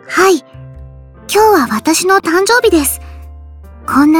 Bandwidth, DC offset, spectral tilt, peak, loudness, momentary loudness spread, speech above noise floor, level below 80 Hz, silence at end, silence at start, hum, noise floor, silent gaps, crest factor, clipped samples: 19 kHz; under 0.1%; -3 dB/octave; 0 dBFS; -11 LUFS; 9 LU; 24 dB; -36 dBFS; 0 s; 0.05 s; none; -34 dBFS; none; 12 dB; under 0.1%